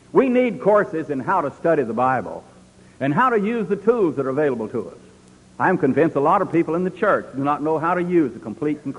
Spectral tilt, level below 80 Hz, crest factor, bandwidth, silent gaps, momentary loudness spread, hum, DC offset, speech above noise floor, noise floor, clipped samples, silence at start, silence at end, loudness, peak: -8 dB/octave; -58 dBFS; 18 dB; 11 kHz; none; 8 LU; none; under 0.1%; 29 dB; -49 dBFS; under 0.1%; 0.15 s; 0 s; -20 LUFS; -2 dBFS